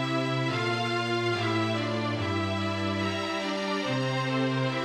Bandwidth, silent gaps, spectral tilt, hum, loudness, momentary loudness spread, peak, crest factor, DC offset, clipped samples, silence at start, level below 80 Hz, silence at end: 12.5 kHz; none; -5.5 dB/octave; none; -28 LUFS; 2 LU; -16 dBFS; 12 dB; under 0.1%; under 0.1%; 0 s; -68 dBFS; 0 s